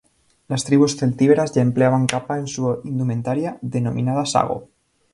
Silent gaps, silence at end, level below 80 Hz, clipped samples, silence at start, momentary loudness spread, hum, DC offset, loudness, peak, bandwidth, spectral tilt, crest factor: none; 0.5 s; -56 dBFS; under 0.1%; 0.5 s; 9 LU; none; under 0.1%; -20 LUFS; 0 dBFS; 11.5 kHz; -6 dB/octave; 20 dB